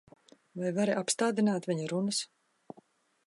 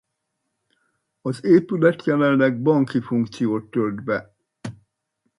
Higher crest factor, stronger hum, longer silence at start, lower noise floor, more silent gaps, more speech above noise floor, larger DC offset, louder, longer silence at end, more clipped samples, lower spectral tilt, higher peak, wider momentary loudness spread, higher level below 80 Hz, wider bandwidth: about the same, 18 dB vs 20 dB; neither; second, 0.55 s vs 1.25 s; second, -64 dBFS vs -77 dBFS; neither; second, 34 dB vs 58 dB; neither; second, -31 LUFS vs -21 LUFS; first, 1 s vs 0.65 s; neither; second, -4.5 dB/octave vs -8 dB/octave; second, -14 dBFS vs -2 dBFS; second, 9 LU vs 17 LU; second, -80 dBFS vs -64 dBFS; about the same, 11.5 kHz vs 11.5 kHz